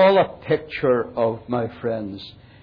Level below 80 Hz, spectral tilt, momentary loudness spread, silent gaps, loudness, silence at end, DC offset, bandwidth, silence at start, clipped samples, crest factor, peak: -54 dBFS; -8.5 dB/octave; 13 LU; none; -22 LUFS; 0.3 s; under 0.1%; 5.2 kHz; 0 s; under 0.1%; 14 dB; -6 dBFS